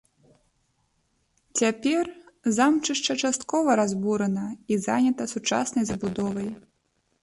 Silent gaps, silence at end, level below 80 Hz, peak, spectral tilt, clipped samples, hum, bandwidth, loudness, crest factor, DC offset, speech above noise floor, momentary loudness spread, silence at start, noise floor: none; 0.65 s; -60 dBFS; -10 dBFS; -4 dB/octave; under 0.1%; none; 11.5 kHz; -25 LUFS; 16 dB; under 0.1%; 47 dB; 9 LU; 1.55 s; -72 dBFS